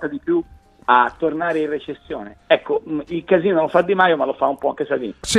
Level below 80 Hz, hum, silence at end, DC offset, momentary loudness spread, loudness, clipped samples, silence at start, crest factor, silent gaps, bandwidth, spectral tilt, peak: -52 dBFS; none; 0 s; under 0.1%; 13 LU; -19 LUFS; under 0.1%; 0 s; 18 dB; none; 14 kHz; -4.5 dB/octave; 0 dBFS